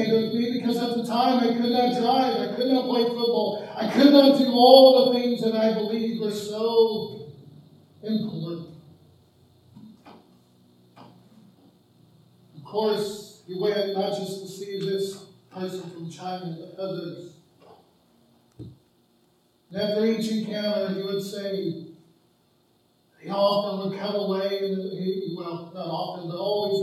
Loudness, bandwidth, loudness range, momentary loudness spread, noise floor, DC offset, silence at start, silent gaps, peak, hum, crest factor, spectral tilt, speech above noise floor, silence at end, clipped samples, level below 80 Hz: -23 LUFS; 13.5 kHz; 18 LU; 18 LU; -64 dBFS; under 0.1%; 0 s; none; 0 dBFS; none; 24 dB; -6 dB/octave; 41 dB; 0 s; under 0.1%; -74 dBFS